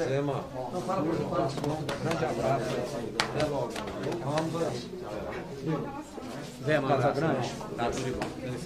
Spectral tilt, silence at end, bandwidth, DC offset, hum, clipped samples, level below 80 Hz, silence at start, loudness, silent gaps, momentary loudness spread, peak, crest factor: -5.5 dB/octave; 0 s; 15.5 kHz; under 0.1%; none; under 0.1%; -54 dBFS; 0 s; -31 LUFS; none; 10 LU; -6 dBFS; 24 dB